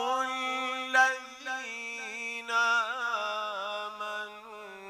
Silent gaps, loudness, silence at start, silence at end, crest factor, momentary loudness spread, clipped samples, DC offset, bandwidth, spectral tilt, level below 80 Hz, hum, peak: none; -30 LUFS; 0 s; 0 s; 22 dB; 12 LU; under 0.1%; under 0.1%; 15.5 kHz; 0 dB/octave; -80 dBFS; 50 Hz at -80 dBFS; -10 dBFS